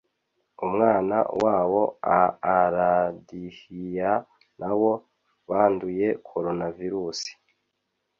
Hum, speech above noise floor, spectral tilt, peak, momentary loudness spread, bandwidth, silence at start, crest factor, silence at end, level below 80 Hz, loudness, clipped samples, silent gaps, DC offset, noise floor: none; 54 dB; -6 dB/octave; -6 dBFS; 13 LU; 7.6 kHz; 0.6 s; 20 dB; 0.85 s; -60 dBFS; -24 LUFS; under 0.1%; none; under 0.1%; -78 dBFS